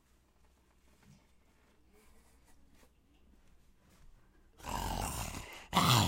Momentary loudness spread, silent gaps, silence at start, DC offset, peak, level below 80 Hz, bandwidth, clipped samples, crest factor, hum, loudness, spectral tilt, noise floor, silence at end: 16 LU; none; 4.05 s; under 0.1%; -12 dBFS; -54 dBFS; 16 kHz; under 0.1%; 28 dB; none; -36 LUFS; -3.5 dB/octave; -68 dBFS; 0 s